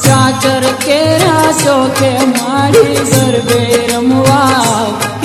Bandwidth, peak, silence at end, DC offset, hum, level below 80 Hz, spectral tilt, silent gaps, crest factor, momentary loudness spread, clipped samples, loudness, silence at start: 16 kHz; 0 dBFS; 0 s; under 0.1%; none; -42 dBFS; -4.5 dB/octave; none; 10 dB; 3 LU; 0.3%; -10 LUFS; 0 s